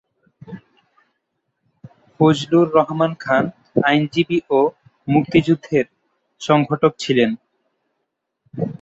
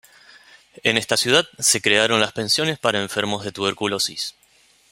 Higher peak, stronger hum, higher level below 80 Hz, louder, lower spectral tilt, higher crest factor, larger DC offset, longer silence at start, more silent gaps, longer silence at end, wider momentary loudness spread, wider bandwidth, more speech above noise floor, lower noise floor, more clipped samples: about the same, -2 dBFS vs 0 dBFS; neither; about the same, -58 dBFS vs -62 dBFS; about the same, -18 LUFS vs -19 LUFS; first, -6.5 dB/octave vs -2 dB/octave; about the same, 18 dB vs 22 dB; neither; second, 0.45 s vs 0.85 s; neither; second, 0.1 s vs 0.6 s; first, 17 LU vs 8 LU; second, 8 kHz vs 16 kHz; first, 59 dB vs 36 dB; first, -76 dBFS vs -57 dBFS; neither